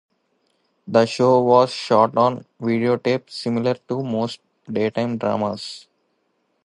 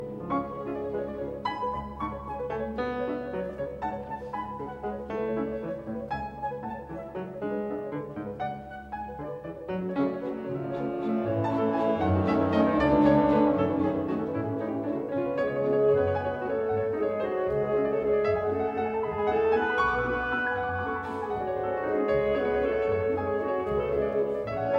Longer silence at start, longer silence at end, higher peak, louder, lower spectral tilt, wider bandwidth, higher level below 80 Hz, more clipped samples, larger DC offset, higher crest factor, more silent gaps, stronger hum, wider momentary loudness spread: first, 0.85 s vs 0 s; first, 0.85 s vs 0 s; first, -2 dBFS vs -10 dBFS; first, -20 LUFS vs -29 LUFS; second, -6.5 dB/octave vs -8.5 dB/octave; first, 11 kHz vs 6.6 kHz; second, -64 dBFS vs -50 dBFS; neither; neither; about the same, 20 dB vs 18 dB; neither; neither; about the same, 12 LU vs 11 LU